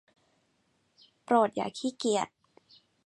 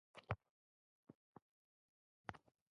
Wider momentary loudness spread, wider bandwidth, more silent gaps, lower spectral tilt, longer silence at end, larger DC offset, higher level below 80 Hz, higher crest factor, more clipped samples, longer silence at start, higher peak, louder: second, 8 LU vs 17 LU; first, 11.5 kHz vs 6.2 kHz; second, none vs 0.50-1.03 s, 1.15-1.35 s, 1.42-2.24 s; about the same, -4 dB/octave vs -5 dB/octave; first, 0.8 s vs 0.35 s; neither; second, -78 dBFS vs -72 dBFS; second, 22 dB vs 30 dB; neither; first, 1.3 s vs 0.15 s; first, -10 dBFS vs -26 dBFS; first, -29 LUFS vs -53 LUFS